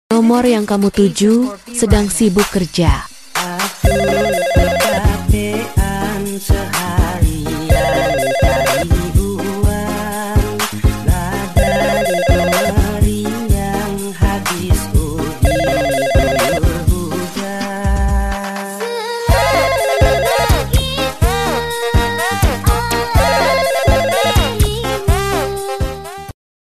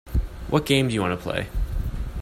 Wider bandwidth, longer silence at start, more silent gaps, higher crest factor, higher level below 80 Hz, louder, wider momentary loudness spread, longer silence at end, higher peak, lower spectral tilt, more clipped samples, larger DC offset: second, 14.5 kHz vs 16 kHz; about the same, 0.1 s vs 0.05 s; neither; about the same, 14 dB vs 18 dB; first, -20 dBFS vs -30 dBFS; first, -15 LUFS vs -25 LUFS; about the same, 8 LU vs 10 LU; first, 0.3 s vs 0 s; first, 0 dBFS vs -6 dBFS; about the same, -5 dB/octave vs -5.5 dB/octave; neither; first, 2% vs under 0.1%